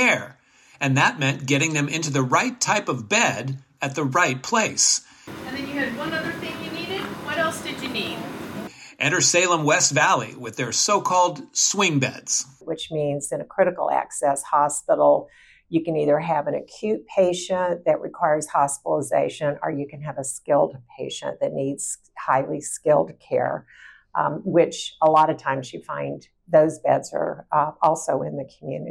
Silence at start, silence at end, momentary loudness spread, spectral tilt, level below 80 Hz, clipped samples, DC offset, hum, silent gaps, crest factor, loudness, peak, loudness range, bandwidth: 0 s; 0 s; 12 LU; -3.5 dB/octave; -66 dBFS; under 0.1%; under 0.1%; none; none; 16 dB; -22 LUFS; -6 dBFS; 5 LU; 17 kHz